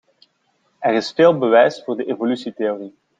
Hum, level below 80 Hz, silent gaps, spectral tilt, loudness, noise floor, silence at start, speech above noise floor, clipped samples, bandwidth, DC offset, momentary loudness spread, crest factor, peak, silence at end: none; -68 dBFS; none; -6 dB/octave; -18 LUFS; -65 dBFS; 0.8 s; 48 dB; under 0.1%; 7.8 kHz; under 0.1%; 10 LU; 16 dB; -2 dBFS; 0.3 s